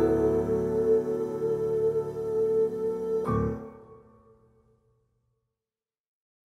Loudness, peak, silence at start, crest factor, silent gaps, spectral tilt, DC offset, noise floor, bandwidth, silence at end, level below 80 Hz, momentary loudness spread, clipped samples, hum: -27 LUFS; -12 dBFS; 0 s; 16 dB; none; -9 dB/octave; under 0.1%; under -90 dBFS; 11 kHz; 2.45 s; -50 dBFS; 6 LU; under 0.1%; none